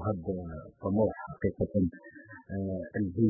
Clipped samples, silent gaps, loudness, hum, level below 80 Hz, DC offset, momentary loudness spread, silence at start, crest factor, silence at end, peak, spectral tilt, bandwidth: under 0.1%; none; -33 LUFS; none; -50 dBFS; under 0.1%; 15 LU; 0 s; 18 dB; 0 s; -14 dBFS; -15 dB/octave; 2.2 kHz